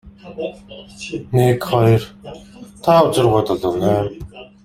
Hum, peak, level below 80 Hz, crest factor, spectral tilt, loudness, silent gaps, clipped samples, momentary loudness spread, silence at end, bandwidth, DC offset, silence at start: none; -2 dBFS; -46 dBFS; 16 dB; -7 dB/octave; -16 LUFS; none; under 0.1%; 23 LU; 0.2 s; 16 kHz; under 0.1%; 0.05 s